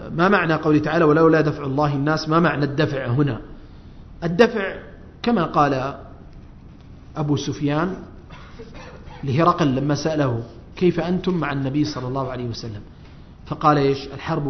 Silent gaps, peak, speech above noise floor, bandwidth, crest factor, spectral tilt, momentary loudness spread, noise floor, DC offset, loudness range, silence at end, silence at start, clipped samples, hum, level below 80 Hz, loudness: none; 0 dBFS; 22 dB; 6.4 kHz; 22 dB; -7 dB/octave; 19 LU; -42 dBFS; under 0.1%; 6 LU; 0 s; 0 s; under 0.1%; none; -44 dBFS; -20 LUFS